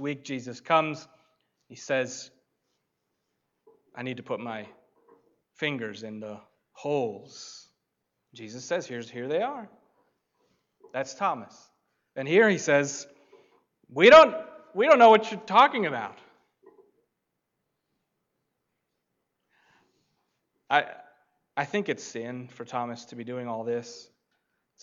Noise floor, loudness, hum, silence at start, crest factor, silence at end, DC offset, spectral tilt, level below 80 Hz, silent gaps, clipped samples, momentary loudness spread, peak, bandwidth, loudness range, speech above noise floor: -81 dBFS; -24 LUFS; none; 0 s; 22 dB; 0.8 s; under 0.1%; -4 dB/octave; -68 dBFS; none; under 0.1%; 23 LU; -4 dBFS; 7.6 kHz; 17 LU; 57 dB